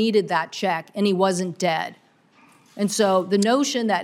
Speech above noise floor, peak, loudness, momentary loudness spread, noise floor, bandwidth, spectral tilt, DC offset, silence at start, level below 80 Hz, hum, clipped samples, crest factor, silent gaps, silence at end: 35 dB; -6 dBFS; -22 LUFS; 6 LU; -56 dBFS; 15.5 kHz; -4.5 dB/octave; under 0.1%; 0 s; -74 dBFS; none; under 0.1%; 16 dB; none; 0 s